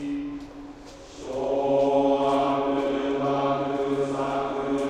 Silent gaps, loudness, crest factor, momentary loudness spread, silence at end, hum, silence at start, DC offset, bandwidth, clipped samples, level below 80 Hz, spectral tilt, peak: none; -25 LUFS; 16 dB; 19 LU; 0 s; none; 0 s; under 0.1%; 9.8 kHz; under 0.1%; -52 dBFS; -6.5 dB/octave; -10 dBFS